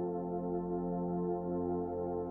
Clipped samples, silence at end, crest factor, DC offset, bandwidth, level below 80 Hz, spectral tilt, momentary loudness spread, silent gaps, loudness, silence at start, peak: under 0.1%; 0 s; 10 dB; under 0.1%; 1.9 kHz; -58 dBFS; -13.5 dB/octave; 2 LU; none; -37 LUFS; 0 s; -26 dBFS